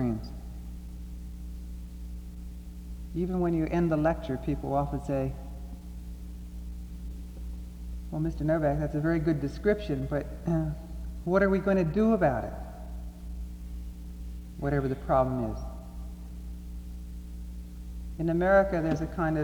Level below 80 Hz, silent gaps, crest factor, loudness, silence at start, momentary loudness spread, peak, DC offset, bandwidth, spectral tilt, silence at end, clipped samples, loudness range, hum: -40 dBFS; none; 18 dB; -29 LUFS; 0 s; 18 LU; -12 dBFS; under 0.1%; 20 kHz; -8.5 dB/octave; 0 s; under 0.1%; 8 LU; 60 Hz at -40 dBFS